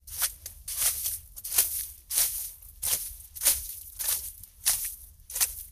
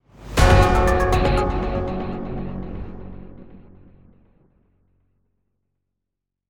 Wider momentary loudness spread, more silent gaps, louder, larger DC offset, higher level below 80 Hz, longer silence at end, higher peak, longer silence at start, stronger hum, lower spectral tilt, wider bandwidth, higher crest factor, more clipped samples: second, 13 LU vs 21 LU; neither; second, -28 LUFS vs -20 LUFS; neither; second, -52 dBFS vs -28 dBFS; second, 0 s vs 2.9 s; second, -6 dBFS vs -2 dBFS; second, 0.05 s vs 0.2 s; neither; second, 1.5 dB/octave vs -6 dB/octave; about the same, 16 kHz vs 17.5 kHz; first, 26 dB vs 20 dB; neither